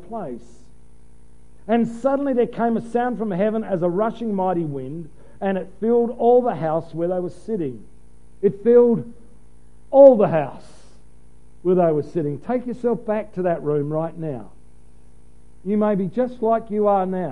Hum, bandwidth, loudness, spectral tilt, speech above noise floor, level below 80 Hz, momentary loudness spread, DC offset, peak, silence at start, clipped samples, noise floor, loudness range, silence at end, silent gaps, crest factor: 60 Hz at -45 dBFS; 10.5 kHz; -20 LUFS; -9 dB/octave; 31 dB; -52 dBFS; 15 LU; 1%; 0 dBFS; 0.1 s; under 0.1%; -51 dBFS; 7 LU; 0 s; none; 22 dB